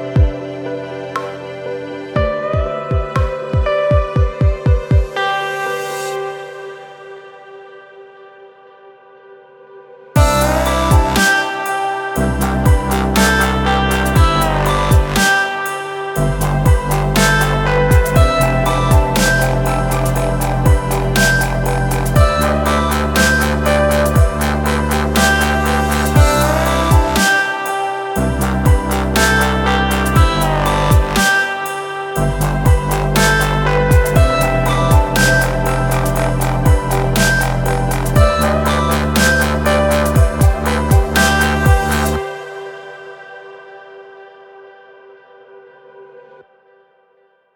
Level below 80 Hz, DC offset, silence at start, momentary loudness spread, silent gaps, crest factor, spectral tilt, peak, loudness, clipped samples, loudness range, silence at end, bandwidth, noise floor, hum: -20 dBFS; under 0.1%; 0 s; 10 LU; none; 14 dB; -5 dB/octave; 0 dBFS; -14 LUFS; under 0.1%; 7 LU; 1.35 s; 19 kHz; -56 dBFS; none